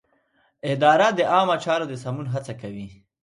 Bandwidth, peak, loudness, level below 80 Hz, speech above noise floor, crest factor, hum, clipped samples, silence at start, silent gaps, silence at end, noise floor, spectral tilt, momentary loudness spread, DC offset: 11.5 kHz; -4 dBFS; -21 LUFS; -62 dBFS; 44 dB; 20 dB; none; under 0.1%; 0.65 s; none; 0.3 s; -65 dBFS; -5.5 dB/octave; 18 LU; under 0.1%